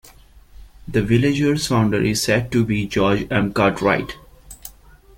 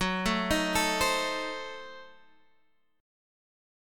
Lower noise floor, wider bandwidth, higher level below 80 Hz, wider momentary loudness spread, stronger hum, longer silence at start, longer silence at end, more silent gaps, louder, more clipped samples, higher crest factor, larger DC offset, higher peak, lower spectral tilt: second, -46 dBFS vs -72 dBFS; about the same, 17 kHz vs 17.5 kHz; first, -42 dBFS vs -48 dBFS; first, 21 LU vs 18 LU; neither; first, 0.6 s vs 0 s; second, 0.5 s vs 1 s; neither; first, -19 LUFS vs -28 LUFS; neither; about the same, 18 dB vs 20 dB; neither; first, -2 dBFS vs -14 dBFS; first, -5.5 dB/octave vs -3 dB/octave